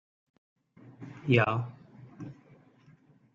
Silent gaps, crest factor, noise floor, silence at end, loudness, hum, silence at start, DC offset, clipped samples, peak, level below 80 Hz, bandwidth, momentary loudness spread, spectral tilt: none; 24 dB; -61 dBFS; 1 s; -29 LUFS; none; 0.85 s; under 0.1%; under 0.1%; -10 dBFS; -70 dBFS; 7.2 kHz; 26 LU; -8 dB/octave